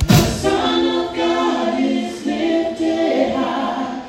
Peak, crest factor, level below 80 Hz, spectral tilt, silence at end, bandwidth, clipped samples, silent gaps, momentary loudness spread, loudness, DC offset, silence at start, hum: 0 dBFS; 18 dB; -34 dBFS; -5.5 dB/octave; 0 s; 16 kHz; under 0.1%; none; 5 LU; -18 LUFS; under 0.1%; 0 s; none